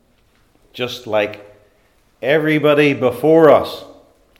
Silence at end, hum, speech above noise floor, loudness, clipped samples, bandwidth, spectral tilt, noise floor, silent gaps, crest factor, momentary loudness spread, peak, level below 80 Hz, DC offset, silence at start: 0.55 s; none; 42 dB; -15 LUFS; under 0.1%; 16 kHz; -6.5 dB/octave; -57 dBFS; none; 16 dB; 15 LU; 0 dBFS; -60 dBFS; under 0.1%; 0.75 s